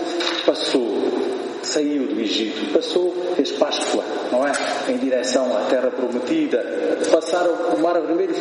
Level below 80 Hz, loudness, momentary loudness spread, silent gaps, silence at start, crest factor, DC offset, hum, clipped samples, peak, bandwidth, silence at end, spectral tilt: -76 dBFS; -21 LUFS; 3 LU; none; 0 s; 20 dB; under 0.1%; none; under 0.1%; 0 dBFS; 10.5 kHz; 0 s; -3 dB/octave